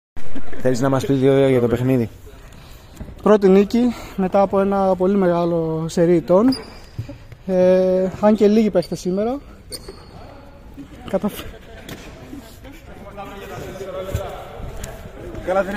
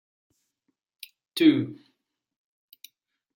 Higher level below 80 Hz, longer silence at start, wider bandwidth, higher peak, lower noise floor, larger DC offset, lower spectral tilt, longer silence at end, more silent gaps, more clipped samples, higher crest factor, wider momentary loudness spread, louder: first, -40 dBFS vs -80 dBFS; second, 0.15 s vs 1.35 s; about the same, 16 kHz vs 16.5 kHz; first, -2 dBFS vs -8 dBFS; second, -40 dBFS vs -78 dBFS; neither; about the same, -7 dB/octave vs -6 dB/octave; second, 0 s vs 1.6 s; neither; neither; second, 16 dB vs 22 dB; second, 23 LU vs 26 LU; first, -18 LUFS vs -24 LUFS